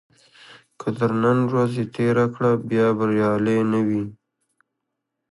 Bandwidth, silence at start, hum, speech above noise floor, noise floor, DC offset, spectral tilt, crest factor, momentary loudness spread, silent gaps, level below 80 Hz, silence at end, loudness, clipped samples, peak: 11.5 kHz; 0.5 s; none; 59 dB; -80 dBFS; under 0.1%; -8.5 dB/octave; 16 dB; 6 LU; none; -60 dBFS; 1.2 s; -21 LUFS; under 0.1%; -6 dBFS